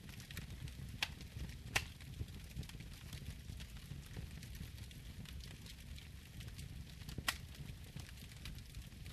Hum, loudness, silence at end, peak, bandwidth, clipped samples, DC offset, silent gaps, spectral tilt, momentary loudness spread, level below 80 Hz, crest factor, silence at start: none; -48 LUFS; 0 s; -18 dBFS; 14 kHz; under 0.1%; under 0.1%; none; -3.5 dB/octave; 11 LU; -54 dBFS; 30 dB; 0 s